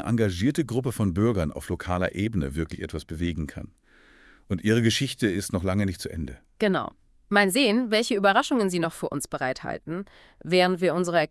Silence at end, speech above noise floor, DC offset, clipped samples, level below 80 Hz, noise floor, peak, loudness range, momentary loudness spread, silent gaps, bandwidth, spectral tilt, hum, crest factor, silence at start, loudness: 0.05 s; 30 dB; under 0.1%; under 0.1%; -48 dBFS; -55 dBFS; -6 dBFS; 5 LU; 14 LU; none; 12 kHz; -5 dB/octave; none; 18 dB; 0 s; -25 LUFS